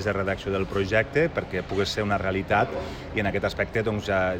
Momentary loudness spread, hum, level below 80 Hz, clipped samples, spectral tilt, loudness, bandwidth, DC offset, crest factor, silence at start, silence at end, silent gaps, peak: 5 LU; none; -44 dBFS; under 0.1%; -6 dB/octave; -26 LUFS; 16 kHz; under 0.1%; 18 dB; 0 s; 0 s; none; -8 dBFS